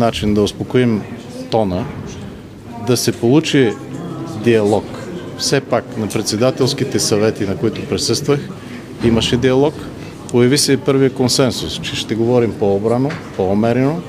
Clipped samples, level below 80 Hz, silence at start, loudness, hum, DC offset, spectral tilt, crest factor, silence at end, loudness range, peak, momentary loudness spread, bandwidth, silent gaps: under 0.1%; -44 dBFS; 0 s; -16 LUFS; none; under 0.1%; -5 dB/octave; 16 dB; 0 s; 3 LU; 0 dBFS; 15 LU; 16 kHz; none